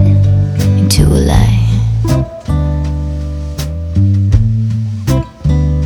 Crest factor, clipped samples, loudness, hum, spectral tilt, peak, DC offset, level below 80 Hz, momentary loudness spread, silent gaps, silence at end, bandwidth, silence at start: 10 dB; 0.3%; -13 LUFS; none; -6.5 dB/octave; 0 dBFS; under 0.1%; -18 dBFS; 9 LU; none; 0 s; 16.5 kHz; 0 s